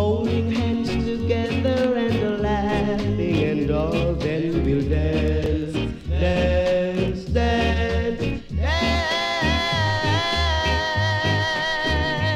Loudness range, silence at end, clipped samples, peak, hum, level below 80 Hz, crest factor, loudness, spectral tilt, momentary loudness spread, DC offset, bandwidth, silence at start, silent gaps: 1 LU; 0 s; under 0.1%; -8 dBFS; none; -30 dBFS; 14 dB; -22 LUFS; -6 dB/octave; 3 LU; under 0.1%; 10.5 kHz; 0 s; none